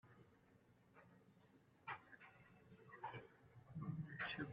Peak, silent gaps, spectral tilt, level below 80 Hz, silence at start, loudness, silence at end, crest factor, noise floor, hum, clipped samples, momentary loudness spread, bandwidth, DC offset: -34 dBFS; none; -4 dB/octave; -82 dBFS; 0.05 s; -53 LUFS; 0 s; 22 dB; -73 dBFS; none; under 0.1%; 20 LU; 5.2 kHz; under 0.1%